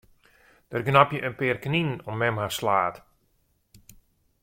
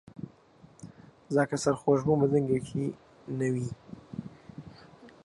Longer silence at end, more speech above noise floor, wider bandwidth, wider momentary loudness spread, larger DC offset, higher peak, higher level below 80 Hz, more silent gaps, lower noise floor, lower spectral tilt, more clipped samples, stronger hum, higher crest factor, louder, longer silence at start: first, 1.45 s vs 0.15 s; first, 44 dB vs 30 dB; first, 16.5 kHz vs 11.5 kHz; second, 10 LU vs 24 LU; neither; first, -4 dBFS vs -12 dBFS; about the same, -60 dBFS vs -62 dBFS; neither; first, -69 dBFS vs -57 dBFS; second, -5.5 dB/octave vs -7 dB/octave; neither; neither; first, 24 dB vs 18 dB; first, -25 LUFS vs -29 LUFS; first, 0.7 s vs 0.2 s